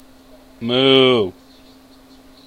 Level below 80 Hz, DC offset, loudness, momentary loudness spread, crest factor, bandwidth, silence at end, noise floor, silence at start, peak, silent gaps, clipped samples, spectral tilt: -56 dBFS; under 0.1%; -15 LUFS; 15 LU; 20 dB; 9.2 kHz; 1.15 s; -46 dBFS; 0.6 s; 0 dBFS; none; under 0.1%; -6 dB/octave